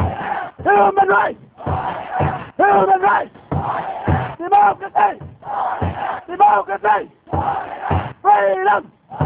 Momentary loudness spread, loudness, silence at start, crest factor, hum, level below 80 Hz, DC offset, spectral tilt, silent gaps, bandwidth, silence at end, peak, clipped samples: 11 LU; -17 LUFS; 0 s; 14 dB; none; -36 dBFS; under 0.1%; -10 dB/octave; none; 4 kHz; 0 s; -2 dBFS; under 0.1%